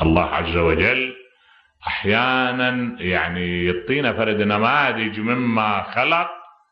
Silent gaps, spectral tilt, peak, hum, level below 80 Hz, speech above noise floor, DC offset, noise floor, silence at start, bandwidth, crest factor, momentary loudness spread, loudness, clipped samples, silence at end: none; -8 dB/octave; -2 dBFS; none; -40 dBFS; 36 dB; under 0.1%; -56 dBFS; 0 s; 6.2 kHz; 18 dB; 7 LU; -20 LUFS; under 0.1%; 0.25 s